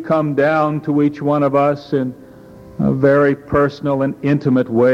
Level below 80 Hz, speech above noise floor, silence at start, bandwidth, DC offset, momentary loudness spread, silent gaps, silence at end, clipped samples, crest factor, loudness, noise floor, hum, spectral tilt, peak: -46 dBFS; 24 dB; 0 s; 6.8 kHz; under 0.1%; 7 LU; none; 0 s; under 0.1%; 14 dB; -16 LUFS; -39 dBFS; none; -9 dB/octave; -2 dBFS